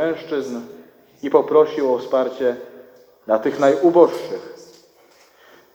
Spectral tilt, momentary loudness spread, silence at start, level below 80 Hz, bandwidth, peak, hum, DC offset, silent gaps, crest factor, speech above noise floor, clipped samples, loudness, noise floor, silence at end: -6 dB/octave; 19 LU; 0 s; -68 dBFS; 16.5 kHz; 0 dBFS; none; under 0.1%; none; 20 dB; 35 dB; under 0.1%; -18 LUFS; -53 dBFS; 1.2 s